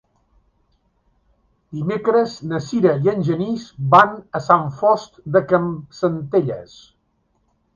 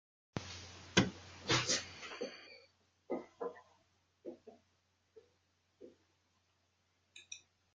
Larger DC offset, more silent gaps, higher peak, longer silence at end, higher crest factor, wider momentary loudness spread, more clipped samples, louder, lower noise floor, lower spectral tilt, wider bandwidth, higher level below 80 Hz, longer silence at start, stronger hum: neither; neither; first, 0 dBFS vs -14 dBFS; first, 1.1 s vs 0.35 s; second, 20 dB vs 30 dB; second, 13 LU vs 25 LU; neither; first, -19 LUFS vs -38 LUFS; second, -66 dBFS vs -78 dBFS; first, -7.5 dB/octave vs -3 dB/octave; second, 7.4 kHz vs 10 kHz; first, -56 dBFS vs -72 dBFS; first, 1.7 s vs 0.35 s; neither